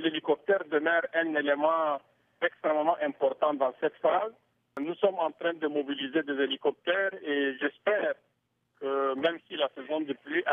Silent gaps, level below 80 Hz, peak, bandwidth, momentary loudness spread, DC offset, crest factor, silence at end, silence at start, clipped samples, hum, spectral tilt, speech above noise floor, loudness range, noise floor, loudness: none; -84 dBFS; -12 dBFS; 3.8 kHz; 7 LU; under 0.1%; 18 dB; 0 s; 0 s; under 0.1%; none; -6.5 dB/octave; 45 dB; 2 LU; -74 dBFS; -29 LUFS